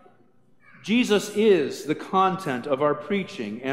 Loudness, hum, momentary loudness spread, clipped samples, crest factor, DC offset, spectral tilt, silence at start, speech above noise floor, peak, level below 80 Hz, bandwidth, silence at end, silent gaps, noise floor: -24 LUFS; none; 10 LU; under 0.1%; 16 dB; 0.1%; -5 dB/octave; 0.85 s; 38 dB; -8 dBFS; -72 dBFS; 16 kHz; 0 s; none; -61 dBFS